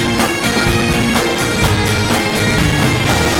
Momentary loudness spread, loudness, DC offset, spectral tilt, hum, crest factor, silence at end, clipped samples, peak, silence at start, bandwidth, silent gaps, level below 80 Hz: 1 LU; -13 LUFS; under 0.1%; -4 dB/octave; none; 14 dB; 0 s; under 0.1%; 0 dBFS; 0 s; 17 kHz; none; -28 dBFS